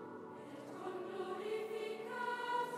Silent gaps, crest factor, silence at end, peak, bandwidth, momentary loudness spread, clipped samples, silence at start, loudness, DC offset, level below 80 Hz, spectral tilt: none; 14 dB; 0 s; -28 dBFS; 15.5 kHz; 11 LU; under 0.1%; 0 s; -43 LUFS; under 0.1%; under -90 dBFS; -4.5 dB/octave